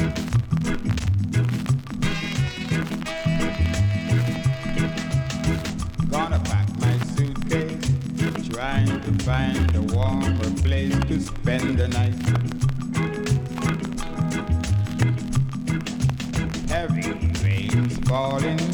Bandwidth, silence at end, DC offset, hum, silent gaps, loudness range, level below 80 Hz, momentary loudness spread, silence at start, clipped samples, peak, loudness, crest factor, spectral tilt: 19 kHz; 0 s; under 0.1%; none; none; 2 LU; -32 dBFS; 4 LU; 0 s; under 0.1%; -4 dBFS; -24 LUFS; 18 dB; -6.5 dB/octave